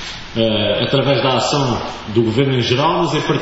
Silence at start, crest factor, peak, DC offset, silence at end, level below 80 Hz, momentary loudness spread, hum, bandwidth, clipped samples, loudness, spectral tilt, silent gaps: 0 s; 14 dB; -2 dBFS; under 0.1%; 0 s; -40 dBFS; 5 LU; none; 8 kHz; under 0.1%; -16 LUFS; -5.5 dB/octave; none